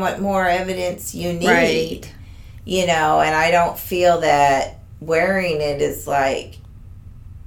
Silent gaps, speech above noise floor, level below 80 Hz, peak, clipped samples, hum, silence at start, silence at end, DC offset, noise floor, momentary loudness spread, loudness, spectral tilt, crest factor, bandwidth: none; 20 dB; -42 dBFS; -2 dBFS; under 0.1%; none; 0 s; 0.05 s; under 0.1%; -38 dBFS; 12 LU; -18 LUFS; -4.5 dB/octave; 16 dB; 18.5 kHz